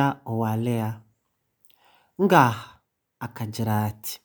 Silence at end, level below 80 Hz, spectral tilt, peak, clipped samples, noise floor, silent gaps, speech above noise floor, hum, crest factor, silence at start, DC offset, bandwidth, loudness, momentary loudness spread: 0.1 s; -66 dBFS; -6.5 dB/octave; 0 dBFS; under 0.1%; -74 dBFS; none; 51 dB; none; 24 dB; 0 s; under 0.1%; over 20 kHz; -24 LUFS; 19 LU